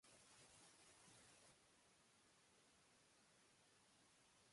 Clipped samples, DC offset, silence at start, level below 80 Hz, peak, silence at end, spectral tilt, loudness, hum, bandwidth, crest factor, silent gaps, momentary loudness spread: under 0.1%; under 0.1%; 0 s; under -90 dBFS; -58 dBFS; 0 s; -2 dB/octave; -68 LUFS; none; 11.5 kHz; 16 dB; none; 1 LU